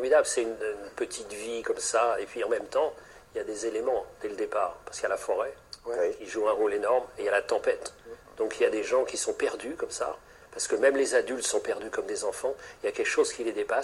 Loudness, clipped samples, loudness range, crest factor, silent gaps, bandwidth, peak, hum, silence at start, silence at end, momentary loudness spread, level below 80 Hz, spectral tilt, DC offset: -29 LUFS; under 0.1%; 3 LU; 20 dB; none; 13 kHz; -10 dBFS; none; 0 s; 0 s; 10 LU; -62 dBFS; -1.5 dB/octave; under 0.1%